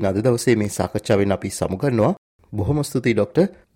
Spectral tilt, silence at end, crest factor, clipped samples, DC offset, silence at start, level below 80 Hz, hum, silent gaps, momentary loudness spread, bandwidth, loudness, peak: -6.5 dB/octave; 0.2 s; 16 dB; under 0.1%; under 0.1%; 0 s; -48 dBFS; none; 2.18-2.39 s; 6 LU; 16.5 kHz; -21 LUFS; -4 dBFS